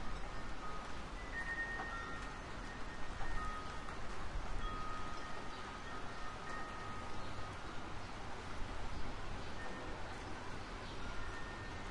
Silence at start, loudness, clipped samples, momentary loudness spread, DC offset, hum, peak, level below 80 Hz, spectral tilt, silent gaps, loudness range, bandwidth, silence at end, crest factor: 0 s; -46 LUFS; under 0.1%; 4 LU; under 0.1%; none; -26 dBFS; -48 dBFS; -4.5 dB/octave; none; 3 LU; 11 kHz; 0 s; 16 dB